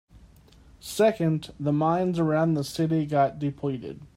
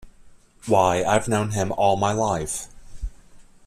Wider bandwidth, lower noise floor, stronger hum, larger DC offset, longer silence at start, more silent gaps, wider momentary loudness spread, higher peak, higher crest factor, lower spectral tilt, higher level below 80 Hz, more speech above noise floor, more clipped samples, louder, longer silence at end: first, 16 kHz vs 14.5 kHz; first, -53 dBFS vs -49 dBFS; neither; neither; first, 0.15 s vs 0 s; neither; second, 9 LU vs 20 LU; second, -10 dBFS vs -4 dBFS; about the same, 16 dB vs 18 dB; first, -7 dB/octave vs -5 dB/octave; second, -56 dBFS vs -42 dBFS; about the same, 28 dB vs 28 dB; neither; second, -26 LUFS vs -22 LUFS; second, 0.1 s vs 0.25 s